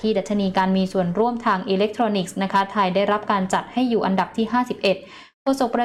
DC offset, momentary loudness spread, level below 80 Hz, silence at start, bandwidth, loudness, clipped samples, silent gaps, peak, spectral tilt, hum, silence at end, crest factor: under 0.1%; 3 LU; -56 dBFS; 0 s; 13 kHz; -21 LUFS; under 0.1%; 5.34-5.46 s; -8 dBFS; -6 dB/octave; none; 0 s; 12 dB